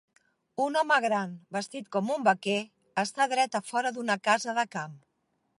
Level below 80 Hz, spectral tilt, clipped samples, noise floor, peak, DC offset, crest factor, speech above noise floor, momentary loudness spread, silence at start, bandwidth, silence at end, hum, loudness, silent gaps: -82 dBFS; -3.5 dB/octave; under 0.1%; -76 dBFS; -10 dBFS; under 0.1%; 20 dB; 48 dB; 10 LU; 0.6 s; 11.5 kHz; 0.6 s; none; -28 LUFS; none